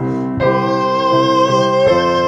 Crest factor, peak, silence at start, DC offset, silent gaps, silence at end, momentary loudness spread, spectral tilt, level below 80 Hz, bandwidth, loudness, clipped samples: 12 dB; -2 dBFS; 0 s; under 0.1%; none; 0 s; 3 LU; -6 dB/octave; -46 dBFS; 8.2 kHz; -14 LUFS; under 0.1%